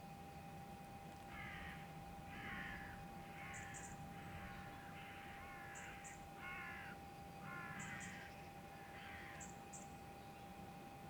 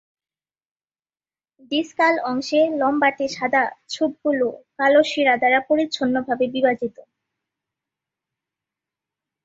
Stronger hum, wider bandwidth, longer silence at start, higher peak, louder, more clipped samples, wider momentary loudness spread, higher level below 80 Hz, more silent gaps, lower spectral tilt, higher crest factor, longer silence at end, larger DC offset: neither; first, over 20 kHz vs 7.8 kHz; second, 0 s vs 1.7 s; second, -36 dBFS vs -4 dBFS; second, -53 LUFS vs -20 LUFS; neither; about the same, 6 LU vs 8 LU; about the same, -66 dBFS vs -66 dBFS; neither; about the same, -4 dB/octave vs -4 dB/octave; about the same, 16 dB vs 18 dB; second, 0 s vs 2.55 s; neither